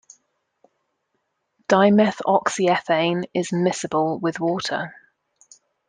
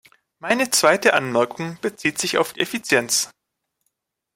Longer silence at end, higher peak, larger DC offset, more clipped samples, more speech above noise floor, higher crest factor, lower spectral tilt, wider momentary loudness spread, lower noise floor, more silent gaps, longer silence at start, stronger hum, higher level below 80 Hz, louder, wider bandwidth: about the same, 1 s vs 1.05 s; about the same, -2 dBFS vs -2 dBFS; neither; neither; about the same, 54 dB vs 57 dB; about the same, 20 dB vs 20 dB; first, -5 dB/octave vs -2.5 dB/octave; about the same, 10 LU vs 11 LU; second, -74 dBFS vs -78 dBFS; neither; first, 1.7 s vs 0.45 s; neither; about the same, -66 dBFS vs -66 dBFS; about the same, -21 LUFS vs -20 LUFS; second, 9.8 kHz vs 16.5 kHz